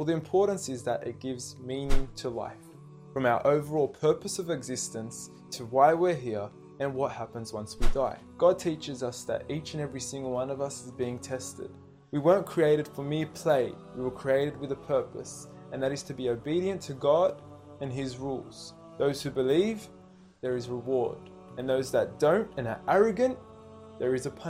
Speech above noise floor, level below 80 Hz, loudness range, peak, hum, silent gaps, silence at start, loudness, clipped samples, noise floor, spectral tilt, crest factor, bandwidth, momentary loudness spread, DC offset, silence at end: 20 dB; -42 dBFS; 3 LU; -8 dBFS; none; none; 0 s; -30 LUFS; under 0.1%; -49 dBFS; -5.5 dB/octave; 20 dB; 15.5 kHz; 16 LU; under 0.1%; 0 s